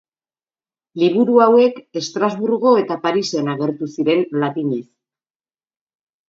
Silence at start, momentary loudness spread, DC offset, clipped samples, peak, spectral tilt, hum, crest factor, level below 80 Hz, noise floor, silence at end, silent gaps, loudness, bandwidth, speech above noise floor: 0.95 s; 11 LU; under 0.1%; under 0.1%; 0 dBFS; -6 dB/octave; none; 18 dB; -70 dBFS; under -90 dBFS; 1.45 s; none; -17 LUFS; 7.6 kHz; over 73 dB